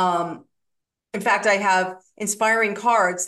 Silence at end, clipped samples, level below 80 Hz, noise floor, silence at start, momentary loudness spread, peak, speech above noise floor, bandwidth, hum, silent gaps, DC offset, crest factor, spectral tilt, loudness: 0 s; under 0.1%; -74 dBFS; -79 dBFS; 0 s; 12 LU; -4 dBFS; 58 dB; 12.5 kHz; none; none; under 0.1%; 18 dB; -3 dB/octave; -21 LUFS